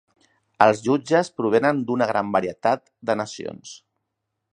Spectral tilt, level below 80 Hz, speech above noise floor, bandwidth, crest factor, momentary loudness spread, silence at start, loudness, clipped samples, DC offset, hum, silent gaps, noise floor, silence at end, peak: -5.5 dB/octave; -66 dBFS; 58 dB; 10.5 kHz; 22 dB; 15 LU; 0.6 s; -22 LUFS; under 0.1%; under 0.1%; none; none; -79 dBFS; 0.8 s; 0 dBFS